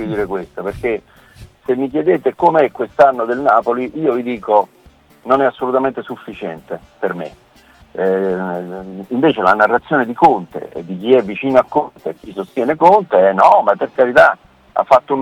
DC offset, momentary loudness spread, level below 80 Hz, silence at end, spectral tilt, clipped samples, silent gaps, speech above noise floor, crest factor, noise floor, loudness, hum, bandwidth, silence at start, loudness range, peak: under 0.1%; 17 LU; -50 dBFS; 0 s; -7 dB/octave; under 0.1%; none; 33 dB; 16 dB; -48 dBFS; -15 LUFS; none; 13 kHz; 0 s; 8 LU; 0 dBFS